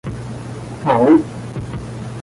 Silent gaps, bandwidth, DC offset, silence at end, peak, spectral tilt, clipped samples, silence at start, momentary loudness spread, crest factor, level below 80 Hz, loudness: none; 11.5 kHz; under 0.1%; 0 s; -2 dBFS; -8 dB/octave; under 0.1%; 0.05 s; 17 LU; 16 dB; -42 dBFS; -17 LUFS